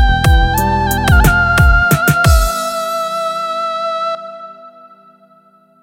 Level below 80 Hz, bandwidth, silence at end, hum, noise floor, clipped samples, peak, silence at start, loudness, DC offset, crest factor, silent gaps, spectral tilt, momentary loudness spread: -18 dBFS; 16.5 kHz; 1.15 s; none; -49 dBFS; under 0.1%; 0 dBFS; 0 s; -13 LUFS; under 0.1%; 14 dB; none; -5 dB/octave; 10 LU